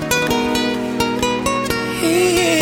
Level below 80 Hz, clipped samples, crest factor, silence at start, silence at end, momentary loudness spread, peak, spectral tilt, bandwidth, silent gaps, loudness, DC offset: -40 dBFS; under 0.1%; 14 dB; 0 s; 0 s; 5 LU; -2 dBFS; -3.5 dB/octave; 17 kHz; none; -17 LUFS; under 0.1%